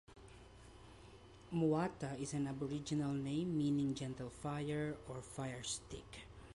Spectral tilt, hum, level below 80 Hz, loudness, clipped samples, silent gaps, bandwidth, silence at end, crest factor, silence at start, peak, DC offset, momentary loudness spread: -6 dB/octave; none; -64 dBFS; -41 LUFS; under 0.1%; none; 11.5 kHz; 0 s; 16 dB; 0.1 s; -24 dBFS; under 0.1%; 23 LU